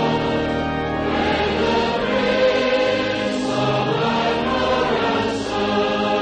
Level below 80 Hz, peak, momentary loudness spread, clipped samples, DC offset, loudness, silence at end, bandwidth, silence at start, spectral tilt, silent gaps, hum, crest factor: -42 dBFS; -6 dBFS; 4 LU; under 0.1%; under 0.1%; -20 LUFS; 0 s; 9.6 kHz; 0 s; -5.5 dB/octave; none; none; 12 dB